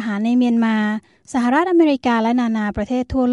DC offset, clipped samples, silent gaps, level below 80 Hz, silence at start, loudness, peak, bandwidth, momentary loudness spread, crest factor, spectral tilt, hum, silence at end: under 0.1%; under 0.1%; none; -44 dBFS; 0 s; -18 LUFS; -4 dBFS; 10.5 kHz; 7 LU; 14 dB; -6.5 dB/octave; none; 0 s